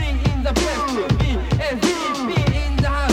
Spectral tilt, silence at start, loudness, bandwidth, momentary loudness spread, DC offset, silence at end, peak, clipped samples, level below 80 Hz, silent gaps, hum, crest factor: -5.5 dB/octave; 0 s; -20 LUFS; 14 kHz; 2 LU; under 0.1%; 0 s; -4 dBFS; under 0.1%; -24 dBFS; none; none; 16 dB